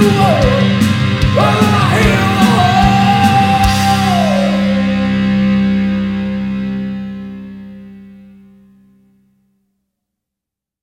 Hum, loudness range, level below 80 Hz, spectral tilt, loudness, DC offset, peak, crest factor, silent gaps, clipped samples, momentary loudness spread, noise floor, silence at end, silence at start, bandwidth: none; 14 LU; -30 dBFS; -6 dB/octave; -12 LUFS; under 0.1%; 0 dBFS; 14 dB; none; under 0.1%; 13 LU; -83 dBFS; 2.7 s; 0 s; 16.5 kHz